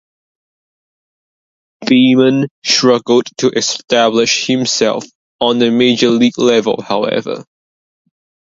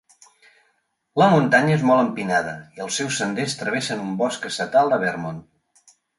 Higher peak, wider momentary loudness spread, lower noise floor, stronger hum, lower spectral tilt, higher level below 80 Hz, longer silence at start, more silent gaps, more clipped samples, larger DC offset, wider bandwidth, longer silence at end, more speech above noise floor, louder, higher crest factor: first, 0 dBFS vs -4 dBFS; second, 7 LU vs 13 LU; first, under -90 dBFS vs -69 dBFS; neither; about the same, -4 dB/octave vs -5 dB/octave; about the same, -60 dBFS vs -62 dBFS; first, 1.8 s vs 1.15 s; first, 2.51-2.62 s, 5.15-5.39 s vs none; neither; neither; second, 7.8 kHz vs 11.5 kHz; first, 1.15 s vs 0.8 s; first, over 78 dB vs 48 dB; first, -12 LUFS vs -21 LUFS; about the same, 14 dB vs 18 dB